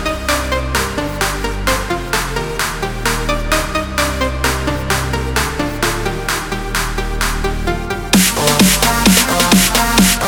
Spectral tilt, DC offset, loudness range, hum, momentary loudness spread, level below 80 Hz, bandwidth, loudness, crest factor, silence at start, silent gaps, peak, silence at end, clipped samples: -3 dB/octave; under 0.1%; 5 LU; none; 9 LU; -24 dBFS; over 20 kHz; -15 LUFS; 16 dB; 0 s; none; 0 dBFS; 0 s; under 0.1%